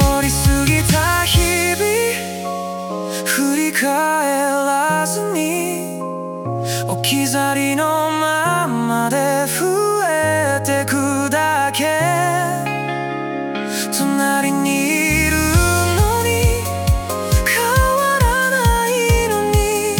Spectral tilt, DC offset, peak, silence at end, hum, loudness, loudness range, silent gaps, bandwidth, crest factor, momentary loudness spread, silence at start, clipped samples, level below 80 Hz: -4 dB/octave; under 0.1%; -2 dBFS; 0 s; none; -17 LUFS; 3 LU; none; 18 kHz; 14 dB; 8 LU; 0 s; under 0.1%; -28 dBFS